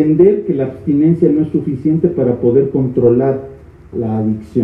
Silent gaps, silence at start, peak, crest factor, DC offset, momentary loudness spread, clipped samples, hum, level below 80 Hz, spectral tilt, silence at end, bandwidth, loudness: none; 0 s; 0 dBFS; 12 dB; under 0.1%; 8 LU; under 0.1%; none; -46 dBFS; -12 dB/octave; 0 s; 3.7 kHz; -14 LUFS